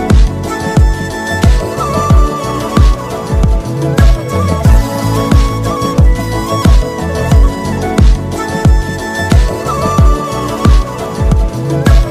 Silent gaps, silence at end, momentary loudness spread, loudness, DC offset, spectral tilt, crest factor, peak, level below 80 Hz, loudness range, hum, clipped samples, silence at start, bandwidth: none; 0 s; 6 LU; -12 LUFS; under 0.1%; -6.5 dB/octave; 10 dB; 0 dBFS; -12 dBFS; 1 LU; none; 0.5%; 0 s; 15 kHz